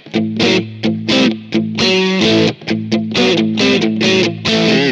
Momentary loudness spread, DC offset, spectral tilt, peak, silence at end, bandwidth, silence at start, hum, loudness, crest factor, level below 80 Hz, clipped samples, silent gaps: 6 LU; under 0.1%; -4.5 dB/octave; 0 dBFS; 0 s; 8.8 kHz; 0.05 s; none; -13 LUFS; 14 dB; -48 dBFS; under 0.1%; none